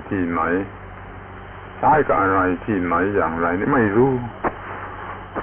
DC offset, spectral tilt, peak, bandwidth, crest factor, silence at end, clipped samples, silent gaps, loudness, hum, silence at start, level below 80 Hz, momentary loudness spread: under 0.1%; -11 dB/octave; -6 dBFS; 3.8 kHz; 14 dB; 0 s; under 0.1%; none; -20 LUFS; none; 0 s; -42 dBFS; 20 LU